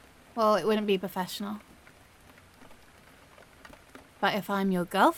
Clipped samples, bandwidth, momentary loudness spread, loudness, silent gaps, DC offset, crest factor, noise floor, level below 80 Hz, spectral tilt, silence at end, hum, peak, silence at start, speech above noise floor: under 0.1%; 17.5 kHz; 20 LU; -29 LUFS; none; under 0.1%; 22 dB; -56 dBFS; -64 dBFS; -5.5 dB/octave; 0 s; none; -8 dBFS; 0.35 s; 29 dB